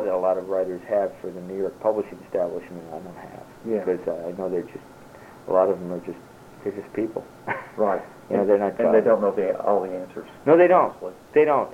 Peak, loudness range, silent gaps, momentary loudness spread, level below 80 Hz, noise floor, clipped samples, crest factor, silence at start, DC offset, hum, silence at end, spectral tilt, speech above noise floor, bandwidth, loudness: -4 dBFS; 8 LU; none; 19 LU; -62 dBFS; -45 dBFS; under 0.1%; 20 dB; 0 s; under 0.1%; none; 0 s; -8 dB/octave; 22 dB; 15.5 kHz; -23 LUFS